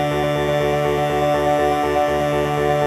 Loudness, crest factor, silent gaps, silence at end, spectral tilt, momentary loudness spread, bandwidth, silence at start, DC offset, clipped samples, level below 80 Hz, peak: -19 LUFS; 12 dB; none; 0 s; -6 dB/octave; 2 LU; 15 kHz; 0 s; under 0.1%; under 0.1%; -38 dBFS; -6 dBFS